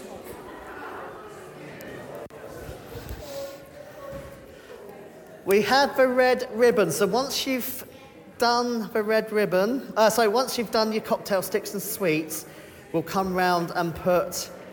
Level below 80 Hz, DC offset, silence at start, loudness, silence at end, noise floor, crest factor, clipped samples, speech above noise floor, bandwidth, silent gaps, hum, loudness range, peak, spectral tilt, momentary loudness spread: -54 dBFS; under 0.1%; 0 s; -24 LUFS; 0 s; -46 dBFS; 20 dB; under 0.1%; 23 dB; 19 kHz; none; none; 16 LU; -6 dBFS; -4 dB/octave; 21 LU